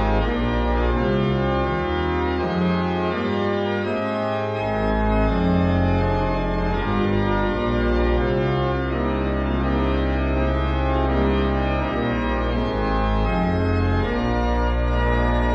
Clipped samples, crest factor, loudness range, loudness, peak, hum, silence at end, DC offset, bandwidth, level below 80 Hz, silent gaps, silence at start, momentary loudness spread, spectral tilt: under 0.1%; 12 dB; 1 LU; -22 LUFS; -8 dBFS; none; 0 s; under 0.1%; 6.4 kHz; -26 dBFS; none; 0 s; 3 LU; -8.5 dB/octave